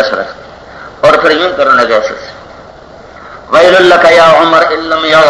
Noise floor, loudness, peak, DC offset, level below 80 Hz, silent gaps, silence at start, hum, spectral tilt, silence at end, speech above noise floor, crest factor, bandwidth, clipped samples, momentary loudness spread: -32 dBFS; -7 LUFS; 0 dBFS; under 0.1%; -42 dBFS; none; 0 s; none; -4 dB/octave; 0 s; 26 dB; 8 dB; 11 kHz; 5%; 14 LU